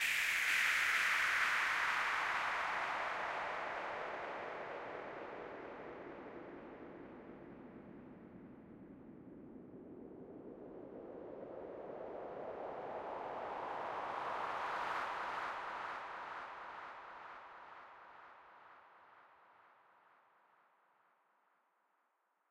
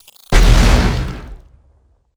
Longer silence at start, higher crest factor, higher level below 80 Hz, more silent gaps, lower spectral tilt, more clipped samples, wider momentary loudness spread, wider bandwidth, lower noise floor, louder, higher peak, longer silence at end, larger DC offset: second, 0 s vs 0.3 s; first, 20 dB vs 14 dB; second, -76 dBFS vs -16 dBFS; neither; second, -1.5 dB/octave vs -5 dB/octave; neither; first, 23 LU vs 15 LU; first, 16 kHz vs 14.5 kHz; first, -81 dBFS vs -54 dBFS; second, -39 LUFS vs -14 LUFS; second, -22 dBFS vs 0 dBFS; first, 2.8 s vs 0.8 s; neither